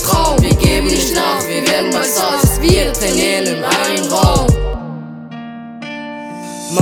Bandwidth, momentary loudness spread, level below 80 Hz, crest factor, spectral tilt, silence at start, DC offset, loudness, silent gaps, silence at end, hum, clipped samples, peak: over 20 kHz; 16 LU; -22 dBFS; 14 dB; -4 dB/octave; 0 s; under 0.1%; -13 LUFS; none; 0 s; none; under 0.1%; 0 dBFS